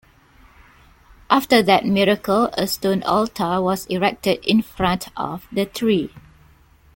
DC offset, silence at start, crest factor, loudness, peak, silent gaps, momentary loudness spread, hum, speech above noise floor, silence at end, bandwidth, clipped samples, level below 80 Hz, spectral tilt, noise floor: under 0.1%; 1.3 s; 20 dB; -19 LUFS; -2 dBFS; none; 9 LU; none; 33 dB; 0.75 s; 17 kHz; under 0.1%; -48 dBFS; -5 dB/octave; -52 dBFS